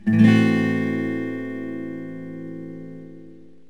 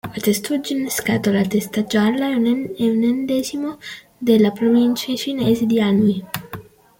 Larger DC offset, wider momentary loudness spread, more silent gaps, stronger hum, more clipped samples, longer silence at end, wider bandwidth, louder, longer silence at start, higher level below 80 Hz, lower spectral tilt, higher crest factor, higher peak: first, 0.5% vs under 0.1%; first, 22 LU vs 12 LU; neither; neither; neither; about the same, 0.35 s vs 0.4 s; second, 9.8 kHz vs 17 kHz; about the same, -21 LUFS vs -19 LUFS; about the same, 0.05 s vs 0.05 s; second, -68 dBFS vs -56 dBFS; first, -8 dB/octave vs -5.5 dB/octave; about the same, 18 dB vs 16 dB; about the same, -4 dBFS vs -4 dBFS